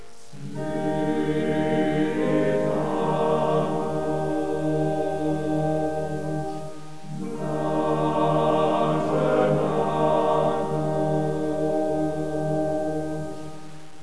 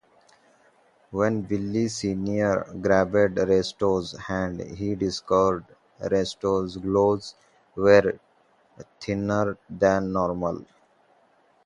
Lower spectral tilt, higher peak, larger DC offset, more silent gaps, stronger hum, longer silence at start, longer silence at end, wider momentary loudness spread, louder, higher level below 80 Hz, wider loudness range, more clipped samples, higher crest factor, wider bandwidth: first, -7.5 dB/octave vs -6 dB/octave; second, -10 dBFS vs -4 dBFS; first, 2% vs under 0.1%; neither; neither; second, 0 s vs 1.1 s; second, 0 s vs 1.05 s; about the same, 12 LU vs 11 LU; about the same, -24 LUFS vs -24 LUFS; about the same, -52 dBFS vs -52 dBFS; about the same, 4 LU vs 3 LU; neither; second, 16 dB vs 22 dB; about the same, 11 kHz vs 11 kHz